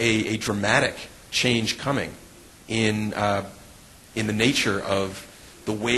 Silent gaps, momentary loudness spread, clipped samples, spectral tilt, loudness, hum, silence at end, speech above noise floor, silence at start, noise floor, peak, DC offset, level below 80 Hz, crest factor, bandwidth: none; 15 LU; under 0.1%; -4 dB/octave; -24 LUFS; none; 0 s; 24 dB; 0 s; -48 dBFS; -4 dBFS; under 0.1%; -52 dBFS; 20 dB; 12.5 kHz